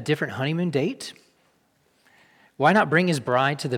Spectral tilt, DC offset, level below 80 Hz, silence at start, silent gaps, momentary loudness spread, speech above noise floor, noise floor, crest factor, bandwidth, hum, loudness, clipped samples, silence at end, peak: -6 dB/octave; under 0.1%; -72 dBFS; 0 s; none; 10 LU; 43 dB; -65 dBFS; 18 dB; 16 kHz; none; -22 LUFS; under 0.1%; 0 s; -6 dBFS